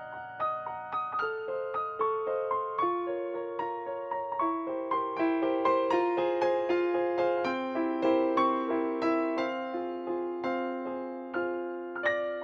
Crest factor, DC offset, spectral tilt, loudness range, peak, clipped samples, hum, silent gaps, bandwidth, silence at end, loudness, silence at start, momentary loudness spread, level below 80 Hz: 16 dB; under 0.1%; -6 dB/octave; 4 LU; -14 dBFS; under 0.1%; none; none; 6.6 kHz; 0 s; -31 LUFS; 0 s; 8 LU; -74 dBFS